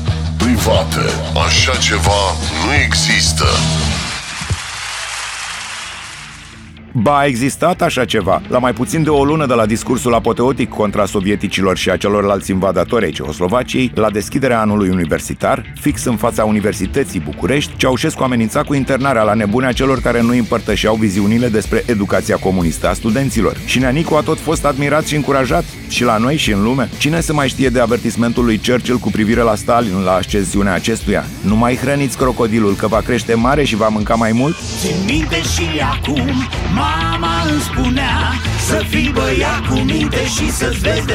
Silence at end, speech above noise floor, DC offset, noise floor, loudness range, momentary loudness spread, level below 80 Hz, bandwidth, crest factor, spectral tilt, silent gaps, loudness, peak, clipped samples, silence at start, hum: 0 s; 20 dB; under 0.1%; -35 dBFS; 2 LU; 5 LU; -28 dBFS; 17.5 kHz; 14 dB; -5 dB/octave; none; -15 LUFS; 0 dBFS; under 0.1%; 0 s; none